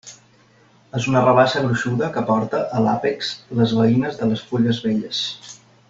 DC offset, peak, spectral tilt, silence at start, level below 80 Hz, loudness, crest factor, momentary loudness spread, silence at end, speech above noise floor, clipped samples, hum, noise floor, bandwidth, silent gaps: under 0.1%; -2 dBFS; -6 dB/octave; 0.05 s; -56 dBFS; -20 LUFS; 18 dB; 10 LU; 0.35 s; 35 dB; under 0.1%; none; -54 dBFS; 7.8 kHz; none